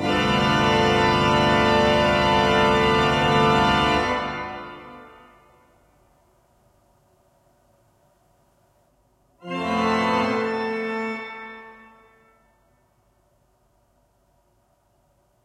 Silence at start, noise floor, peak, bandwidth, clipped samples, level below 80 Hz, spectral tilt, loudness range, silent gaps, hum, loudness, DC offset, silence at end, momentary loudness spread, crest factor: 0 s; -64 dBFS; -6 dBFS; 15 kHz; under 0.1%; -44 dBFS; -5 dB/octave; 17 LU; none; none; -20 LUFS; under 0.1%; 3.7 s; 18 LU; 18 dB